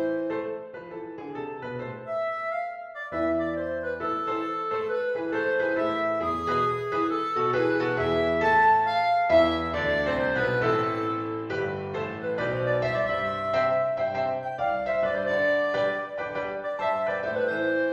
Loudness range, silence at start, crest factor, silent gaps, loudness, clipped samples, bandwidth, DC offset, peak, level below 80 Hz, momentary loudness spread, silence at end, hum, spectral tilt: 7 LU; 0 s; 16 dB; none; -26 LUFS; under 0.1%; 8.4 kHz; under 0.1%; -10 dBFS; -54 dBFS; 10 LU; 0 s; none; -6.5 dB/octave